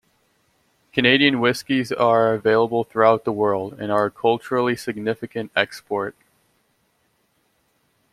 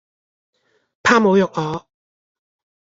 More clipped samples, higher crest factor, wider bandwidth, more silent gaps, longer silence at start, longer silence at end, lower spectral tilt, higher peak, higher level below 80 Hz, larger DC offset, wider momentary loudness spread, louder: neither; about the same, 22 dB vs 20 dB; first, 15 kHz vs 7.8 kHz; neither; about the same, 0.95 s vs 1.05 s; first, 2 s vs 1.15 s; about the same, -5.5 dB/octave vs -5.5 dB/octave; about the same, 0 dBFS vs -2 dBFS; about the same, -62 dBFS vs -60 dBFS; neither; second, 10 LU vs 13 LU; second, -20 LUFS vs -17 LUFS